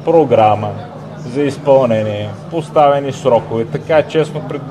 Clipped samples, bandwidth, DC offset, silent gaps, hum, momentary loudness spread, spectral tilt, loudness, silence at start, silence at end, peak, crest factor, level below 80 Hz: under 0.1%; 10.5 kHz; 0.1%; none; none; 12 LU; -7 dB/octave; -14 LUFS; 0 s; 0 s; 0 dBFS; 14 dB; -52 dBFS